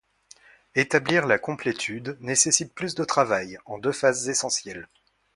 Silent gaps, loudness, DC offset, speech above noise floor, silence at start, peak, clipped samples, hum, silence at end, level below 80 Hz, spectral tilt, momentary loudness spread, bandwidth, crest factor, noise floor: none; -24 LUFS; under 0.1%; 30 dB; 0.75 s; -2 dBFS; under 0.1%; none; 0.5 s; -64 dBFS; -2.5 dB/octave; 10 LU; 11.5 kHz; 24 dB; -54 dBFS